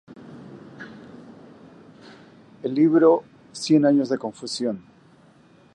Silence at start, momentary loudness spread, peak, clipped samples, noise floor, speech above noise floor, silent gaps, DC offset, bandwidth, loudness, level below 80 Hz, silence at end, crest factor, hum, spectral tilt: 0.1 s; 26 LU; -6 dBFS; under 0.1%; -54 dBFS; 34 dB; none; under 0.1%; 11 kHz; -21 LUFS; -70 dBFS; 0.95 s; 20 dB; none; -6 dB/octave